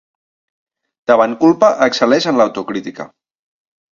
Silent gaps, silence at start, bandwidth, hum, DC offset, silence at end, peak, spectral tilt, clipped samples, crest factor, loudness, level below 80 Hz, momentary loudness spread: none; 1.1 s; 7.6 kHz; none; under 0.1%; 0.9 s; 0 dBFS; -5 dB/octave; under 0.1%; 16 dB; -13 LUFS; -60 dBFS; 17 LU